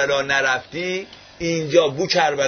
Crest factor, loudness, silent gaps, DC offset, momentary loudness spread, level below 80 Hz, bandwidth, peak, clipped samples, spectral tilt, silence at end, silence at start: 18 dB; -20 LUFS; none; under 0.1%; 10 LU; -54 dBFS; 6.6 kHz; -2 dBFS; under 0.1%; -3.5 dB/octave; 0 s; 0 s